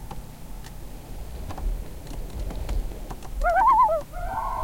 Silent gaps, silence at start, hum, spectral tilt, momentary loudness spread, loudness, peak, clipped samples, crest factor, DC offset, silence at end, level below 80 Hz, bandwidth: none; 0 s; none; -5.5 dB/octave; 23 LU; -25 LUFS; -10 dBFS; under 0.1%; 16 dB; 0.3%; 0 s; -34 dBFS; 17 kHz